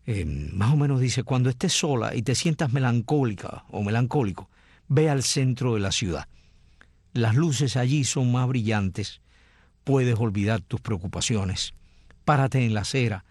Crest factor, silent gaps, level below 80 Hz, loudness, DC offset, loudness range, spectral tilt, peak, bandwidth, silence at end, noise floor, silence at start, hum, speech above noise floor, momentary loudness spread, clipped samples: 16 dB; none; -48 dBFS; -25 LUFS; under 0.1%; 2 LU; -5.5 dB/octave; -8 dBFS; 12.5 kHz; 0.1 s; -58 dBFS; 0.05 s; none; 34 dB; 8 LU; under 0.1%